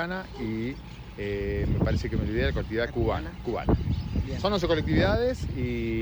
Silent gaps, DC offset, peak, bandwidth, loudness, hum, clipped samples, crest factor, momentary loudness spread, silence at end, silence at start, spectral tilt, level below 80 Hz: none; under 0.1%; -12 dBFS; over 20 kHz; -28 LUFS; none; under 0.1%; 14 dB; 9 LU; 0 s; 0 s; -7.5 dB/octave; -34 dBFS